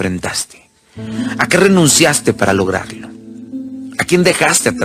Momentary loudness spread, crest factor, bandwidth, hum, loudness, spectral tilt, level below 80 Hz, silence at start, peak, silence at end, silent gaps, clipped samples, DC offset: 20 LU; 14 dB; 16 kHz; none; -13 LUFS; -3.5 dB/octave; -48 dBFS; 0 s; 0 dBFS; 0 s; none; under 0.1%; under 0.1%